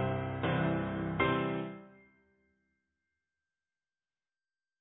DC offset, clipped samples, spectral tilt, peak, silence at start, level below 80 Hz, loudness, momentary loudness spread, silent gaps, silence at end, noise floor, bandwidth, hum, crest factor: under 0.1%; under 0.1%; -4 dB/octave; -14 dBFS; 0 s; -58 dBFS; -33 LUFS; 10 LU; none; 2.9 s; under -90 dBFS; 3.9 kHz; none; 22 dB